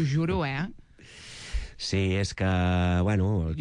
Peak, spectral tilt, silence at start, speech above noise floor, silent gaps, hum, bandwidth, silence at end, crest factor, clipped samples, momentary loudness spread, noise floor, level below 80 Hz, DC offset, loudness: -16 dBFS; -6.5 dB/octave; 0 s; 23 dB; none; none; 10.5 kHz; 0 s; 10 dB; under 0.1%; 13 LU; -49 dBFS; -42 dBFS; under 0.1%; -27 LUFS